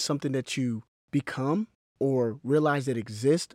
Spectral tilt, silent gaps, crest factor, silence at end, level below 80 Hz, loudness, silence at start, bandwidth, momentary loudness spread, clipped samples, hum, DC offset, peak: -6 dB/octave; 0.88-1.08 s, 1.75-1.95 s; 16 dB; 0.1 s; -72 dBFS; -28 LUFS; 0 s; 15.5 kHz; 7 LU; under 0.1%; none; under 0.1%; -12 dBFS